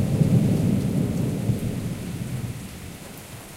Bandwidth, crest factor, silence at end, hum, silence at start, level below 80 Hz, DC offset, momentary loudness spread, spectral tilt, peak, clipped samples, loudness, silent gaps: 16 kHz; 16 dB; 0 s; none; 0 s; -42 dBFS; under 0.1%; 18 LU; -7.5 dB/octave; -8 dBFS; under 0.1%; -24 LUFS; none